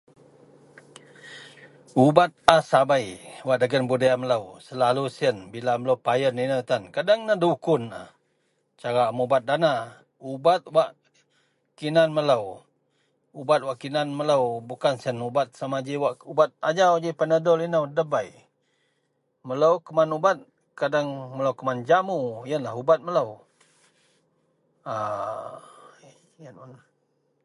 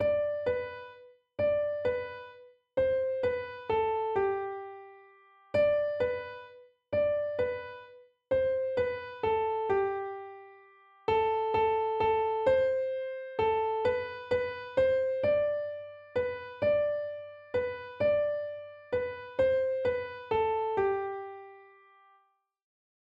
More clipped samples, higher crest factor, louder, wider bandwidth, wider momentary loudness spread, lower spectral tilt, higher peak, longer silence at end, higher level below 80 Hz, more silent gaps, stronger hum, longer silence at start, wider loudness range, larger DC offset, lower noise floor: neither; first, 24 dB vs 16 dB; first, -24 LUFS vs -31 LUFS; first, 11.5 kHz vs 5.4 kHz; about the same, 13 LU vs 14 LU; second, -5.5 dB/octave vs -7 dB/octave; first, 0 dBFS vs -16 dBFS; second, 0.7 s vs 1.5 s; about the same, -66 dBFS vs -62 dBFS; neither; neither; first, 1.25 s vs 0 s; first, 6 LU vs 3 LU; neither; about the same, -73 dBFS vs -70 dBFS